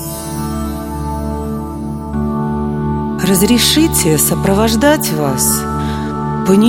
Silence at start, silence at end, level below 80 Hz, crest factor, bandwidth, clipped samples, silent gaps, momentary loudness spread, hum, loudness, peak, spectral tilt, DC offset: 0 s; 0 s; -28 dBFS; 14 dB; 17 kHz; under 0.1%; none; 12 LU; none; -14 LUFS; 0 dBFS; -4.5 dB/octave; under 0.1%